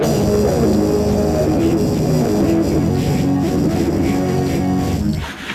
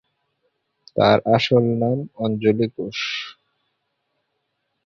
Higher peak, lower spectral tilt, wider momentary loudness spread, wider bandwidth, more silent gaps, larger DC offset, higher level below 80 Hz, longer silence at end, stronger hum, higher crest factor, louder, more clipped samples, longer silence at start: about the same, -6 dBFS vs -4 dBFS; about the same, -7 dB/octave vs -6.5 dB/octave; second, 3 LU vs 11 LU; first, 14.5 kHz vs 7.2 kHz; neither; neither; first, -32 dBFS vs -58 dBFS; second, 0 s vs 1.55 s; neither; second, 10 dB vs 18 dB; first, -17 LUFS vs -20 LUFS; neither; second, 0 s vs 0.95 s